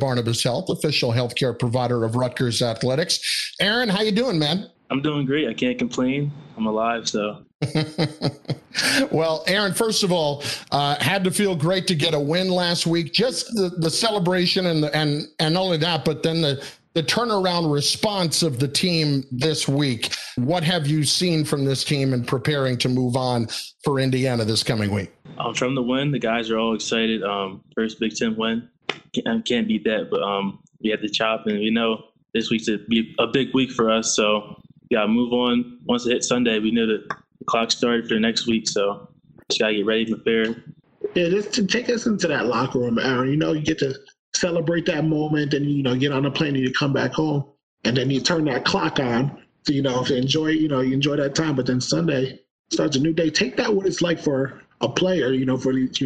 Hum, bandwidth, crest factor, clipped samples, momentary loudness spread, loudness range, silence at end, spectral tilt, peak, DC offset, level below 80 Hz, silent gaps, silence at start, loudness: none; 12.5 kHz; 18 dB; under 0.1%; 6 LU; 3 LU; 0 s; -4.5 dB/octave; -4 dBFS; under 0.1%; -56 dBFS; 7.55-7.59 s, 44.19-44.32 s, 47.63-47.77 s, 52.51-52.64 s; 0 s; -22 LUFS